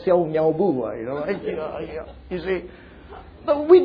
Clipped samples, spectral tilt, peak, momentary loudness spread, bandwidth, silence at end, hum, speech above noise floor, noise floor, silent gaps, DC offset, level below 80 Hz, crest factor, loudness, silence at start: under 0.1%; -10 dB/octave; -2 dBFS; 20 LU; 5 kHz; 0 s; none; 21 dB; -42 dBFS; none; under 0.1%; -48 dBFS; 20 dB; -24 LUFS; 0 s